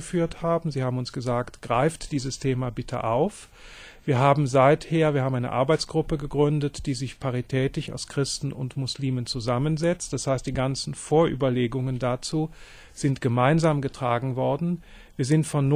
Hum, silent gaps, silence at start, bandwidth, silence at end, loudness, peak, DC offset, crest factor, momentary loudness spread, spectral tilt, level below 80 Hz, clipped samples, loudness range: none; none; 0 s; 11.5 kHz; 0 s; -25 LUFS; -6 dBFS; under 0.1%; 20 dB; 10 LU; -6 dB/octave; -46 dBFS; under 0.1%; 4 LU